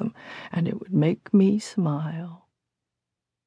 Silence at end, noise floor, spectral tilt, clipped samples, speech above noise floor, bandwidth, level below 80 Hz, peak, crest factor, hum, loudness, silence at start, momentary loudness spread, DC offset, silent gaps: 1.1 s; -86 dBFS; -8 dB/octave; under 0.1%; 63 dB; 10.5 kHz; -70 dBFS; -8 dBFS; 18 dB; none; -25 LUFS; 0 s; 15 LU; under 0.1%; none